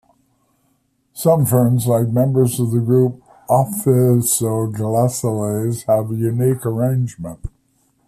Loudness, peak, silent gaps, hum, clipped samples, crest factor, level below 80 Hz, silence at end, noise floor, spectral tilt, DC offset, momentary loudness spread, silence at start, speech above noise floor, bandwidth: -17 LUFS; -2 dBFS; none; none; under 0.1%; 14 dB; -46 dBFS; 0.6 s; -64 dBFS; -7 dB/octave; under 0.1%; 9 LU; 1.15 s; 47 dB; 15 kHz